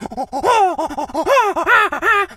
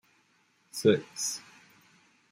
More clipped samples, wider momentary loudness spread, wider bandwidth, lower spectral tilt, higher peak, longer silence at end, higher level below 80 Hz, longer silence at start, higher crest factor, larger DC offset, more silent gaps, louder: neither; second, 9 LU vs 15 LU; about the same, 16 kHz vs 16 kHz; about the same, -3 dB/octave vs -4 dB/octave; first, -2 dBFS vs -10 dBFS; second, 0 s vs 0.9 s; first, -48 dBFS vs -74 dBFS; second, 0 s vs 0.75 s; second, 16 dB vs 24 dB; neither; neither; first, -15 LUFS vs -29 LUFS